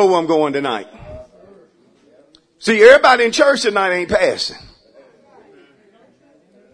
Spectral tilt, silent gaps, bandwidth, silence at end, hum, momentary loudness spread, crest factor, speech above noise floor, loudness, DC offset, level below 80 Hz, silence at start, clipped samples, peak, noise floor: -3.5 dB/octave; none; 11 kHz; 2.15 s; none; 16 LU; 16 dB; 40 dB; -13 LUFS; under 0.1%; -50 dBFS; 0 s; 0.1%; 0 dBFS; -53 dBFS